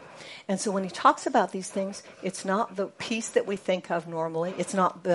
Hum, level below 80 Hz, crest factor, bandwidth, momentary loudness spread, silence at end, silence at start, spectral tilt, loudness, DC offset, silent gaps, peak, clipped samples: none; -74 dBFS; 22 dB; 11.5 kHz; 11 LU; 0 s; 0 s; -4.5 dB/octave; -28 LUFS; under 0.1%; none; -6 dBFS; under 0.1%